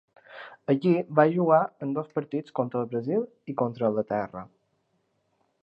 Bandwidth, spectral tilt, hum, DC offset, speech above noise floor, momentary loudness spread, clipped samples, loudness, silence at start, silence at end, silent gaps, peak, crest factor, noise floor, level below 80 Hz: 5.8 kHz; -10 dB/octave; none; under 0.1%; 47 dB; 15 LU; under 0.1%; -26 LUFS; 0.3 s; 1.2 s; none; -6 dBFS; 22 dB; -73 dBFS; -72 dBFS